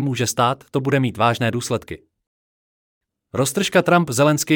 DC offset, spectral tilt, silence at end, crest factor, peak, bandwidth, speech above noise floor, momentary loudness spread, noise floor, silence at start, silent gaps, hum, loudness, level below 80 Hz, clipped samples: under 0.1%; -5 dB/octave; 0 s; 16 dB; -4 dBFS; 18.5 kHz; over 71 dB; 11 LU; under -90 dBFS; 0 s; 2.27-3.01 s; none; -19 LUFS; -58 dBFS; under 0.1%